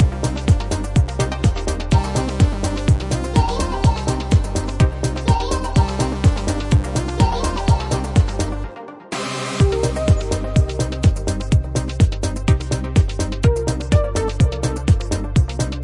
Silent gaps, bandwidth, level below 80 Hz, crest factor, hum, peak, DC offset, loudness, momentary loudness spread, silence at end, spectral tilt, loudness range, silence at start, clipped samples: none; 11.5 kHz; -24 dBFS; 16 dB; none; -2 dBFS; under 0.1%; -19 LUFS; 4 LU; 0 s; -6 dB/octave; 1 LU; 0 s; under 0.1%